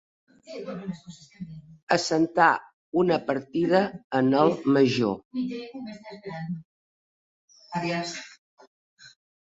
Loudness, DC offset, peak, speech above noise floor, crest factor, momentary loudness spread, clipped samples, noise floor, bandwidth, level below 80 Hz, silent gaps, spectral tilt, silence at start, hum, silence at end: -25 LUFS; under 0.1%; -4 dBFS; over 64 dB; 22 dB; 21 LU; under 0.1%; under -90 dBFS; 8 kHz; -66 dBFS; 1.83-1.87 s, 2.74-2.92 s, 4.04-4.10 s, 5.25-5.31 s, 6.65-7.48 s, 8.38-8.57 s, 8.67-8.97 s; -5.5 dB/octave; 0.5 s; none; 0.45 s